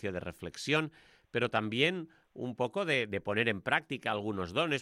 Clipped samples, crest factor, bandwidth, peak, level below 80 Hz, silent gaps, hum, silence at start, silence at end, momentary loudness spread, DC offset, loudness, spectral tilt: under 0.1%; 22 dB; 15 kHz; -12 dBFS; -66 dBFS; none; none; 0 s; 0 s; 12 LU; under 0.1%; -33 LUFS; -5 dB/octave